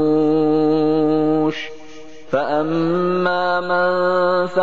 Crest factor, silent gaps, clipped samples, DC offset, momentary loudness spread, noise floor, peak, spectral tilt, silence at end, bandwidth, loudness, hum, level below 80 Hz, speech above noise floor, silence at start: 12 dB; none; under 0.1%; 2%; 6 LU; -40 dBFS; -4 dBFS; -7.5 dB/octave; 0 s; 7.4 kHz; -18 LUFS; none; -64 dBFS; 22 dB; 0 s